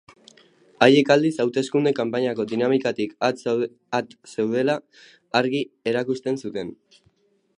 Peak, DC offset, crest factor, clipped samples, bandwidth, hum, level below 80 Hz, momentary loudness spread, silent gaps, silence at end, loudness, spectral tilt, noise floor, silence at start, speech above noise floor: 0 dBFS; under 0.1%; 22 dB; under 0.1%; 10.5 kHz; none; -70 dBFS; 11 LU; none; 0.85 s; -22 LUFS; -5.5 dB/octave; -64 dBFS; 0.8 s; 41 dB